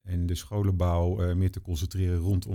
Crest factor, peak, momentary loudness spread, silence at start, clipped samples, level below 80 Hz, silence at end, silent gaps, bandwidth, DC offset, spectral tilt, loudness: 12 dB; -16 dBFS; 5 LU; 0.05 s; under 0.1%; -38 dBFS; 0 s; none; 16 kHz; under 0.1%; -7.5 dB/octave; -28 LUFS